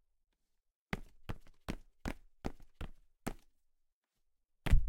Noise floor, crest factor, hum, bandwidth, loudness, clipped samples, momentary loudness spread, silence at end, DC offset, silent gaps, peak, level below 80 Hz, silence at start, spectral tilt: -80 dBFS; 24 dB; none; 16 kHz; -46 LUFS; under 0.1%; 7 LU; 0 s; under 0.1%; 3.93-4.02 s; -14 dBFS; -40 dBFS; 0.95 s; -6 dB/octave